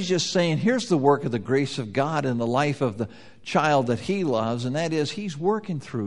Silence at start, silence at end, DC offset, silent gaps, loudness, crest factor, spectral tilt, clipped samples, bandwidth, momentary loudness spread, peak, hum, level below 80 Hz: 0 s; 0 s; 0.3%; none; -24 LUFS; 18 dB; -5.5 dB/octave; under 0.1%; 11.5 kHz; 7 LU; -6 dBFS; none; -62 dBFS